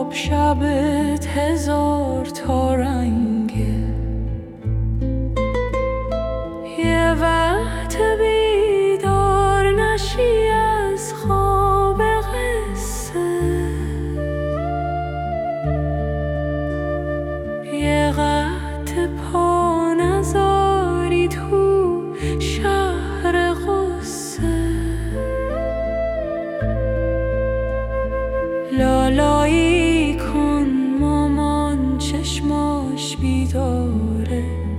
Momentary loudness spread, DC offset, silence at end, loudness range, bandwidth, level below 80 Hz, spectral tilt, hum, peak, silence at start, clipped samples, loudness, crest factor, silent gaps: 8 LU; under 0.1%; 0 s; 5 LU; 16 kHz; -28 dBFS; -6 dB/octave; none; -4 dBFS; 0 s; under 0.1%; -20 LUFS; 14 dB; none